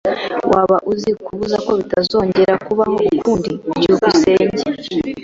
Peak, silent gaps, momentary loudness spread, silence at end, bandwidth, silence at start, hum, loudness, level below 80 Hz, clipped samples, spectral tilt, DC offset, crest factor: -2 dBFS; none; 9 LU; 0 s; 7.8 kHz; 0.05 s; none; -16 LUFS; -46 dBFS; under 0.1%; -5.5 dB/octave; under 0.1%; 14 dB